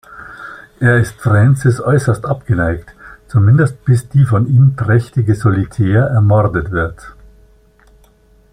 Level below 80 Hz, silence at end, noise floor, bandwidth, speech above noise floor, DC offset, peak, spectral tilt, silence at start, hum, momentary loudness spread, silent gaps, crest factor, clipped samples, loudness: -38 dBFS; 1.4 s; -49 dBFS; 10.5 kHz; 37 dB; under 0.1%; -2 dBFS; -8.5 dB/octave; 0.1 s; none; 10 LU; none; 12 dB; under 0.1%; -13 LUFS